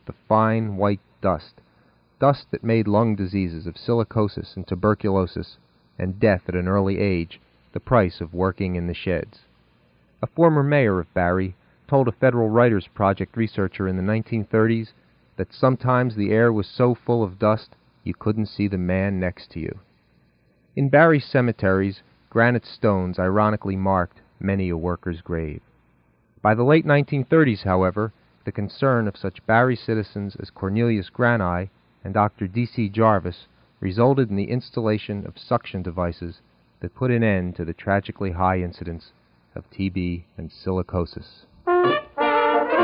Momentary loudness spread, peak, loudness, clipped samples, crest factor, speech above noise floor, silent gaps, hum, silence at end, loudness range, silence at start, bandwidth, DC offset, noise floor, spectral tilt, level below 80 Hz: 14 LU; -2 dBFS; -22 LUFS; under 0.1%; 20 dB; 40 dB; none; none; 0 s; 5 LU; 0.05 s; 5.4 kHz; under 0.1%; -61 dBFS; -12 dB/octave; -48 dBFS